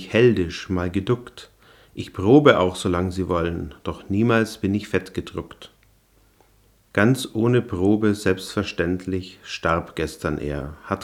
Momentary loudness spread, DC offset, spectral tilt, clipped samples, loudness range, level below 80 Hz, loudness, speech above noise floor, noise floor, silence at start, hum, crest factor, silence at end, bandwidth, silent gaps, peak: 15 LU; under 0.1%; -6.5 dB/octave; under 0.1%; 5 LU; -48 dBFS; -22 LUFS; 37 dB; -58 dBFS; 0 s; none; 22 dB; 0 s; 15 kHz; none; 0 dBFS